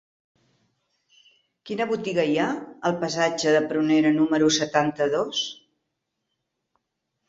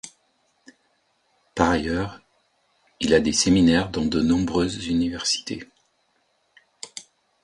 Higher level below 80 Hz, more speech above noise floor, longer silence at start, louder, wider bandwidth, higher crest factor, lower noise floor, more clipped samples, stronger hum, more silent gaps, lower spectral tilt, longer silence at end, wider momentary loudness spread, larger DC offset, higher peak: second, -68 dBFS vs -44 dBFS; first, 57 dB vs 47 dB; first, 1.65 s vs 0.05 s; about the same, -23 LUFS vs -22 LUFS; second, 7.8 kHz vs 11.5 kHz; about the same, 20 dB vs 22 dB; first, -80 dBFS vs -68 dBFS; neither; neither; neither; about the same, -4 dB/octave vs -4.5 dB/octave; first, 1.75 s vs 0.45 s; second, 8 LU vs 20 LU; neither; second, -6 dBFS vs -2 dBFS